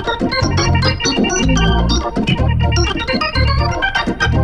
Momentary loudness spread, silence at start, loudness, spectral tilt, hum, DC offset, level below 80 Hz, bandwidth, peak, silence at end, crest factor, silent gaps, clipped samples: 3 LU; 0 s; -15 LUFS; -4.5 dB/octave; none; under 0.1%; -20 dBFS; 9.8 kHz; -2 dBFS; 0 s; 14 dB; none; under 0.1%